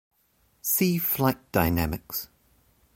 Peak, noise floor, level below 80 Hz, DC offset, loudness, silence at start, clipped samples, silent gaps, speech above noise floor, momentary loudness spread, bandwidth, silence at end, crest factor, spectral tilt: -8 dBFS; -67 dBFS; -44 dBFS; under 0.1%; -26 LUFS; 0.65 s; under 0.1%; none; 41 dB; 11 LU; 17 kHz; 0.7 s; 20 dB; -5 dB/octave